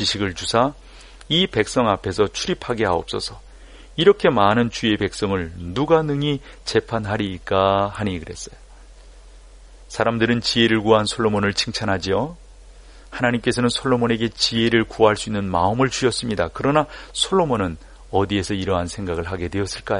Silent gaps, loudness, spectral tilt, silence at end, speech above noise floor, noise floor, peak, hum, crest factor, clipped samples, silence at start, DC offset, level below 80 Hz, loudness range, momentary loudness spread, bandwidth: none; -20 LUFS; -5 dB/octave; 0 s; 23 dB; -44 dBFS; -2 dBFS; none; 20 dB; under 0.1%; 0 s; under 0.1%; -42 dBFS; 4 LU; 10 LU; 11 kHz